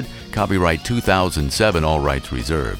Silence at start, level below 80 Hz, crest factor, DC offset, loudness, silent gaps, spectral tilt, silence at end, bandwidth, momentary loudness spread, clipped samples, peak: 0 s; -30 dBFS; 18 dB; under 0.1%; -19 LUFS; none; -5 dB/octave; 0 s; 18 kHz; 6 LU; under 0.1%; 0 dBFS